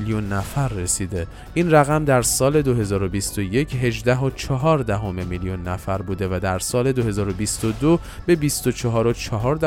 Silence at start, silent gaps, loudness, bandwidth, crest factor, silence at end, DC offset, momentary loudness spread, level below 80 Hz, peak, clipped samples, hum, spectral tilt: 0 s; none; -21 LUFS; 17 kHz; 18 dB; 0 s; under 0.1%; 9 LU; -38 dBFS; -2 dBFS; under 0.1%; none; -5.5 dB/octave